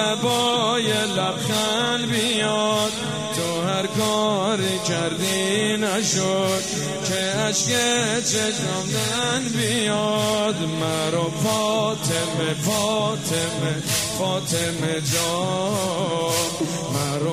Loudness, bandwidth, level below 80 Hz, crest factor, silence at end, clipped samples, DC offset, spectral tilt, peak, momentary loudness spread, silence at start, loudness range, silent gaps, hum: -21 LUFS; 15.5 kHz; -56 dBFS; 14 dB; 0 s; under 0.1%; 0.1%; -3.5 dB/octave; -8 dBFS; 4 LU; 0 s; 2 LU; none; none